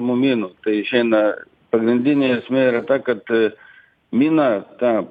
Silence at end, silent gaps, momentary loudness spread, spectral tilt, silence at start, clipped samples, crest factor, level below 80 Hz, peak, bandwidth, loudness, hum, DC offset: 0 s; none; 6 LU; -8.5 dB/octave; 0 s; under 0.1%; 14 dB; -66 dBFS; -4 dBFS; 4.9 kHz; -19 LUFS; none; under 0.1%